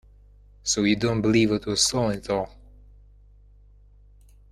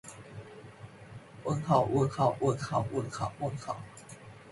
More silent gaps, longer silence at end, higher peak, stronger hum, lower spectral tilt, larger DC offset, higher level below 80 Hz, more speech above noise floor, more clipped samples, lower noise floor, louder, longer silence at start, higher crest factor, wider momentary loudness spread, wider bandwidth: neither; first, 2.05 s vs 0 s; first, -6 dBFS vs -12 dBFS; first, 50 Hz at -45 dBFS vs none; second, -4 dB/octave vs -7 dB/octave; neither; first, -48 dBFS vs -60 dBFS; first, 29 dB vs 20 dB; neither; about the same, -52 dBFS vs -50 dBFS; first, -23 LUFS vs -31 LUFS; first, 0.65 s vs 0.05 s; about the same, 20 dB vs 20 dB; second, 8 LU vs 22 LU; first, 13 kHz vs 11.5 kHz